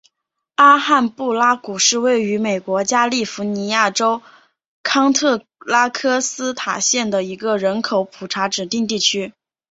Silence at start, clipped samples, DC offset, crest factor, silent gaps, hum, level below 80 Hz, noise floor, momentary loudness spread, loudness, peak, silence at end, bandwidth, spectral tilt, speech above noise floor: 0.6 s; under 0.1%; under 0.1%; 18 dB; 4.68-4.84 s; none; -64 dBFS; -75 dBFS; 9 LU; -17 LUFS; 0 dBFS; 0.4 s; 8.2 kHz; -2.5 dB/octave; 58 dB